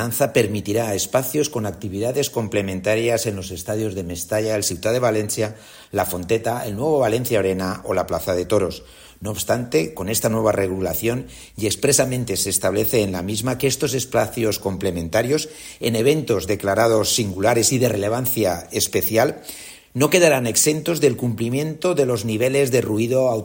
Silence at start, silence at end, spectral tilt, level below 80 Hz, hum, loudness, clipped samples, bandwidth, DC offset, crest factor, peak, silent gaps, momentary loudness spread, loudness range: 0 s; 0 s; -4 dB/octave; -48 dBFS; none; -20 LUFS; under 0.1%; 16.5 kHz; under 0.1%; 20 dB; -2 dBFS; none; 9 LU; 4 LU